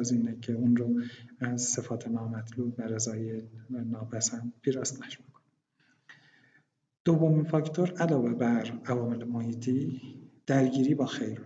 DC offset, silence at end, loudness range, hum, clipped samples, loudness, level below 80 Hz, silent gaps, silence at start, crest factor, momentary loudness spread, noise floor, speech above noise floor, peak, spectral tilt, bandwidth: under 0.1%; 0 s; 7 LU; none; under 0.1%; -30 LUFS; -76 dBFS; 7.00-7.05 s; 0 s; 18 dB; 12 LU; -71 dBFS; 42 dB; -12 dBFS; -5.5 dB/octave; 9.2 kHz